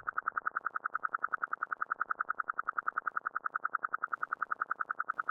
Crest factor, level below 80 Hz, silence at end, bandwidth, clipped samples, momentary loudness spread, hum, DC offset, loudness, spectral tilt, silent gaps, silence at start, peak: 20 dB; -82 dBFS; 0 s; 2.5 kHz; under 0.1%; 1 LU; none; under 0.1%; -36 LUFS; -5.5 dB/octave; none; 0.05 s; -18 dBFS